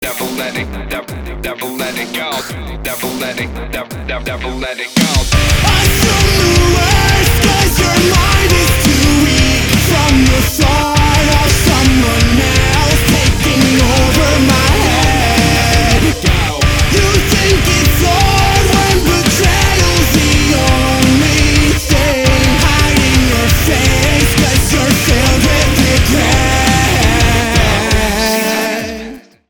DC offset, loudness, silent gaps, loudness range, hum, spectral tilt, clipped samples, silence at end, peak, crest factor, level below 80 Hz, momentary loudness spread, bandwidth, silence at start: under 0.1%; -11 LUFS; none; 6 LU; none; -4 dB/octave; under 0.1%; 0.3 s; 0 dBFS; 10 dB; -16 dBFS; 10 LU; over 20 kHz; 0 s